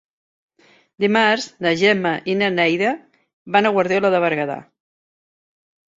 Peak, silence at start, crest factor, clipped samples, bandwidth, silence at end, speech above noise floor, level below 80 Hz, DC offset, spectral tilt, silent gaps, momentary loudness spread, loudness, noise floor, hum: -2 dBFS; 1 s; 20 dB; under 0.1%; 7.8 kHz; 1.35 s; over 72 dB; -66 dBFS; under 0.1%; -5 dB/octave; 3.33-3.45 s; 7 LU; -18 LUFS; under -90 dBFS; none